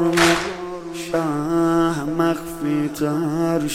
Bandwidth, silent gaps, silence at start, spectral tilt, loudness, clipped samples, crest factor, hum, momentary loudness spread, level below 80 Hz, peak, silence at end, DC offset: 16 kHz; none; 0 s; -5 dB/octave; -21 LUFS; under 0.1%; 18 dB; none; 10 LU; -46 dBFS; -2 dBFS; 0 s; under 0.1%